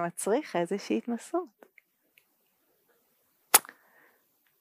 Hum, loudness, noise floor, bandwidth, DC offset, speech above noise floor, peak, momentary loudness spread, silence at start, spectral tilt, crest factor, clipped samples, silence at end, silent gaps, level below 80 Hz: none; -28 LUFS; -72 dBFS; 15.5 kHz; under 0.1%; 41 dB; -2 dBFS; 12 LU; 0 s; -2.5 dB/octave; 32 dB; under 0.1%; 1 s; none; under -90 dBFS